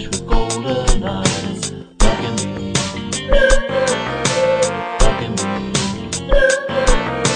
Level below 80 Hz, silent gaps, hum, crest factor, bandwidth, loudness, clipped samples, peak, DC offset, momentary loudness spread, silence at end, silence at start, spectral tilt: -20 dBFS; none; none; 16 dB; 9.8 kHz; -18 LUFS; under 0.1%; 0 dBFS; 0.2%; 7 LU; 0 s; 0 s; -3.5 dB/octave